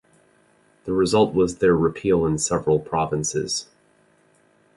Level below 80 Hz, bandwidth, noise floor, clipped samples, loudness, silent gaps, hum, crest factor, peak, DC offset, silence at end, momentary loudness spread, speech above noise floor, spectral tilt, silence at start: -48 dBFS; 11.5 kHz; -60 dBFS; under 0.1%; -21 LUFS; none; none; 18 dB; -6 dBFS; under 0.1%; 1.15 s; 8 LU; 39 dB; -5 dB/octave; 0.85 s